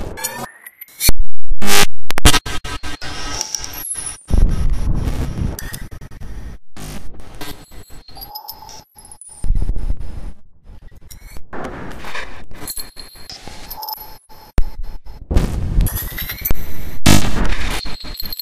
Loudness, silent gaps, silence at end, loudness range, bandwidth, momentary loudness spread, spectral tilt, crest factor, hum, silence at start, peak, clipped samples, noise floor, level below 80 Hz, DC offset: -21 LUFS; none; 0 s; 13 LU; 16 kHz; 22 LU; -3.5 dB/octave; 12 dB; none; 0 s; 0 dBFS; 1%; -40 dBFS; -22 dBFS; under 0.1%